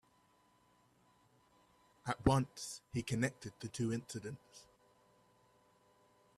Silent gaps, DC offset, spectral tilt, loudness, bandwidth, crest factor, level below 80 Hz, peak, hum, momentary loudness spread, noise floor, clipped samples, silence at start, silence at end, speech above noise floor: none; under 0.1%; -5.5 dB/octave; -39 LUFS; 13.5 kHz; 26 dB; -60 dBFS; -16 dBFS; 60 Hz at -65 dBFS; 15 LU; -72 dBFS; under 0.1%; 2.05 s; 1.75 s; 33 dB